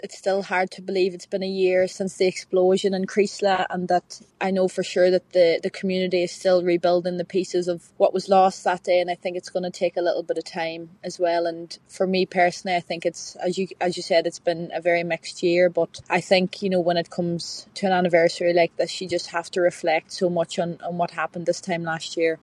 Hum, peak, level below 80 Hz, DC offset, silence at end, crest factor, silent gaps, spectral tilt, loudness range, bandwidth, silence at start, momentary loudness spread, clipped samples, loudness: none; -4 dBFS; -70 dBFS; under 0.1%; 0.1 s; 18 dB; none; -5 dB/octave; 3 LU; 11 kHz; 0.05 s; 9 LU; under 0.1%; -23 LUFS